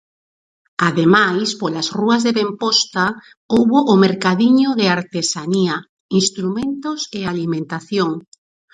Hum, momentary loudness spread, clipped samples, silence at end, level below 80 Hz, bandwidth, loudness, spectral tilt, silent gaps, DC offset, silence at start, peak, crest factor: none; 10 LU; under 0.1%; 0.55 s; -58 dBFS; 9.6 kHz; -17 LUFS; -4.5 dB/octave; 3.37-3.49 s, 5.89-6.09 s; under 0.1%; 0.8 s; 0 dBFS; 18 dB